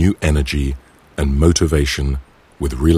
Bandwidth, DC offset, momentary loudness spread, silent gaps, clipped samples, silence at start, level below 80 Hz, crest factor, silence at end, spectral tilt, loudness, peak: 14.5 kHz; under 0.1%; 13 LU; none; under 0.1%; 0 s; -22 dBFS; 16 dB; 0 s; -5.5 dB/octave; -18 LUFS; 0 dBFS